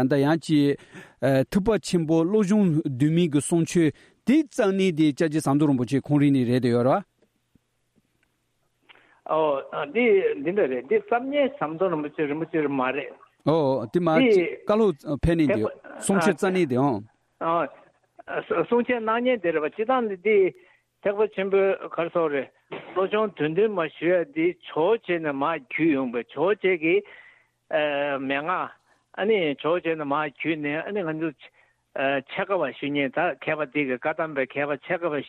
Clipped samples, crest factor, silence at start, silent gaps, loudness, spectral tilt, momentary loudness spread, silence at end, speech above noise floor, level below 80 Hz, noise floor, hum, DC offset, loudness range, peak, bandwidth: under 0.1%; 16 dB; 0 s; none; -24 LUFS; -6.5 dB/octave; 7 LU; 0 s; 48 dB; -52 dBFS; -71 dBFS; none; under 0.1%; 5 LU; -8 dBFS; 14 kHz